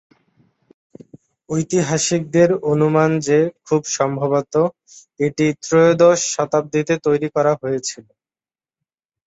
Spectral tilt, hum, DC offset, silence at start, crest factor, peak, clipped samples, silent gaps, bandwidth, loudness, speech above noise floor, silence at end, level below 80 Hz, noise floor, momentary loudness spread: -5 dB/octave; none; under 0.1%; 1.5 s; 18 dB; -2 dBFS; under 0.1%; none; 8.2 kHz; -18 LUFS; over 73 dB; 1.25 s; -60 dBFS; under -90 dBFS; 9 LU